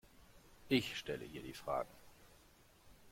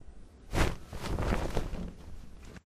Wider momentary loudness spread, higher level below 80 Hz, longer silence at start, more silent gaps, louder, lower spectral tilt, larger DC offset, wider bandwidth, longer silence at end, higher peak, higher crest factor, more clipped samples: second, 14 LU vs 19 LU; second, -68 dBFS vs -38 dBFS; first, 0.2 s vs 0 s; neither; second, -41 LUFS vs -35 LUFS; about the same, -5 dB/octave vs -5.5 dB/octave; neither; about the same, 16.5 kHz vs 15.5 kHz; about the same, 0 s vs 0.1 s; second, -22 dBFS vs -14 dBFS; about the same, 22 dB vs 22 dB; neither